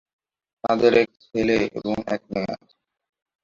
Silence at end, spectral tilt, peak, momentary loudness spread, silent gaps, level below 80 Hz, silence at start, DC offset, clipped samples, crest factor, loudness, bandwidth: 0.9 s; -6 dB/octave; -4 dBFS; 13 LU; none; -54 dBFS; 0.65 s; under 0.1%; under 0.1%; 20 dB; -23 LUFS; 7.4 kHz